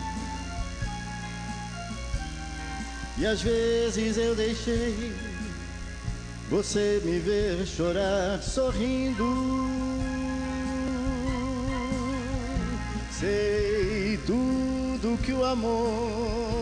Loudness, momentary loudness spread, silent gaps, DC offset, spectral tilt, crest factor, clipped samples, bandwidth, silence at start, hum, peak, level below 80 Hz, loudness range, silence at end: -29 LUFS; 10 LU; none; under 0.1%; -5.5 dB/octave; 14 dB; under 0.1%; 10 kHz; 0 s; none; -14 dBFS; -38 dBFS; 3 LU; 0 s